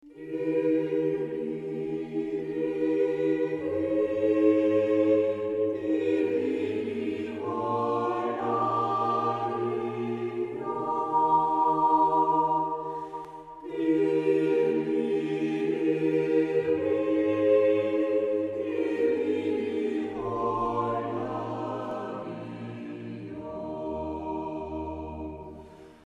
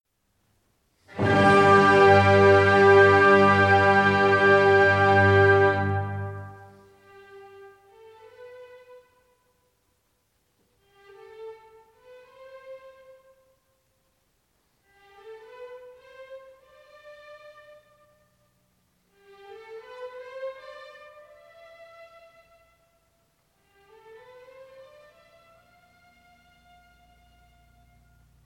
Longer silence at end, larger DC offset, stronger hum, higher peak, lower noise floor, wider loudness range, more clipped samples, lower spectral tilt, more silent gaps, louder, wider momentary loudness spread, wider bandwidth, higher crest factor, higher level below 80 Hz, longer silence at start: second, 0.1 s vs 7.95 s; neither; neither; second, -10 dBFS vs -6 dBFS; second, -48 dBFS vs -71 dBFS; second, 8 LU vs 27 LU; neither; first, -8 dB/octave vs -6.5 dB/octave; neither; second, -27 LUFS vs -18 LUFS; second, 13 LU vs 28 LU; second, 7.6 kHz vs 10.5 kHz; about the same, 16 dB vs 20 dB; first, -58 dBFS vs -64 dBFS; second, 0.05 s vs 1.15 s